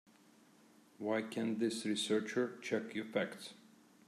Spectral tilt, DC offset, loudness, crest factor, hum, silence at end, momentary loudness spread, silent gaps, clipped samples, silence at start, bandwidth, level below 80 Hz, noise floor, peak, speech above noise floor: -4 dB/octave; under 0.1%; -38 LUFS; 18 dB; none; 0.45 s; 8 LU; none; under 0.1%; 1 s; 14 kHz; -90 dBFS; -66 dBFS; -20 dBFS; 28 dB